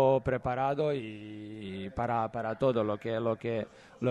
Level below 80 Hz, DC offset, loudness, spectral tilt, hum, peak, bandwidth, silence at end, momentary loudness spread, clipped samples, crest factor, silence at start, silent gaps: -58 dBFS; under 0.1%; -32 LUFS; -8 dB/octave; none; -14 dBFS; 9 kHz; 0 s; 13 LU; under 0.1%; 16 dB; 0 s; none